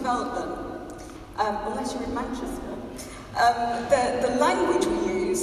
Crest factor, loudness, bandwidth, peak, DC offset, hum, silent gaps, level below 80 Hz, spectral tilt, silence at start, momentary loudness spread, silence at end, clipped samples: 18 dB; -26 LUFS; 13.5 kHz; -8 dBFS; under 0.1%; none; none; -46 dBFS; -4 dB/octave; 0 s; 15 LU; 0 s; under 0.1%